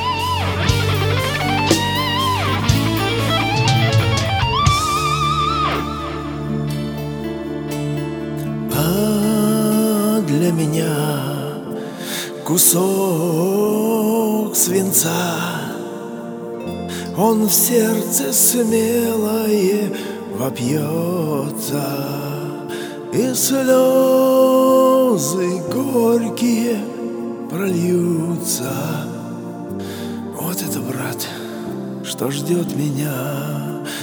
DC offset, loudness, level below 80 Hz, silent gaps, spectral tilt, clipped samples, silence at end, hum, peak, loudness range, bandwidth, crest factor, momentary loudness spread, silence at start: under 0.1%; -18 LUFS; -40 dBFS; none; -4.5 dB/octave; under 0.1%; 0 s; none; 0 dBFS; 8 LU; over 20 kHz; 18 dB; 14 LU; 0 s